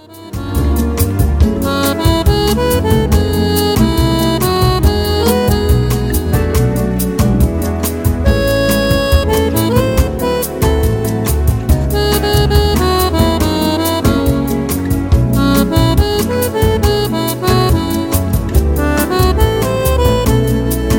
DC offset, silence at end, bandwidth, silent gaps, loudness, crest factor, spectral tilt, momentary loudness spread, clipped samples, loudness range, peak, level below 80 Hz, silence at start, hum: under 0.1%; 0 s; 17 kHz; none; -13 LUFS; 12 dB; -6 dB/octave; 4 LU; under 0.1%; 1 LU; 0 dBFS; -18 dBFS; 0.1 s; none